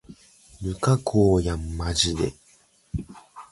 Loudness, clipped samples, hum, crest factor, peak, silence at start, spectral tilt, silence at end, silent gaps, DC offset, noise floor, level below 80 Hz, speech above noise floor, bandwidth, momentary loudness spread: -24 LUFS; under 0.1%; none; 20 dB; -6 dBFS; 0.1 s; -5.5 dB/octave; 0.05 s; none; under 0.1%; -59 dBFS; -38 dBFS; 37 dB; 11.5 kHz; 15 LU